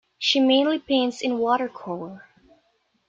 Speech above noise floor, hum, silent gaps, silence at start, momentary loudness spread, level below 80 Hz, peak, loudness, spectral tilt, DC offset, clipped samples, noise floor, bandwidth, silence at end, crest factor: 45 dB; none; none; 0.2 s; 15 LU; -68 dBFS; -8 dBFS; -22 LUFS; -3.5 dB/octave; under 0.1%; under 0.1%; -68 dBFS; 7.6 kHz; 0.9 s; 16 dB